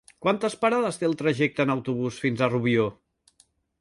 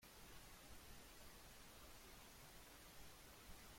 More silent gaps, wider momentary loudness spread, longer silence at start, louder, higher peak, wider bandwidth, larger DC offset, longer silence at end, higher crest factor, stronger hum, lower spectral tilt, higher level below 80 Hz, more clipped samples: neither; first, 4 LU vs 0 LU; first, 0.2 s vs 0 s; first, -25 LUFS vs -61 LUFS; first, -8 dBFS vs -46 dBFS; second, 11.5 kHz vs 16.5 kHz; neither; first, 0.9 s vs 0 s; about the same, 18 dB vs 16 dB; neither; first, -6 dB/octave vs -2.5 dB/octave; first, -62 dBFS vs -68 dBFS; neither